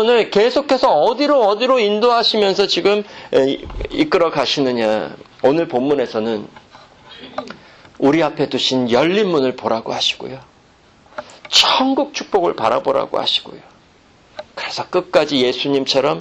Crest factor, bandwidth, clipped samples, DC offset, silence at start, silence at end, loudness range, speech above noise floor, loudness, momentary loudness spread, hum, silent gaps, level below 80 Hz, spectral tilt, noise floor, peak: 18 dB; 12.5 kHz; under 0.1%; under 0.1%; 0 s; 0 s; 5 LU; 34 dB; -16 LUFS; 14 LU; none; none; -46 dBFS; -4 dB/octave; -50 dBFS; 0 dBFS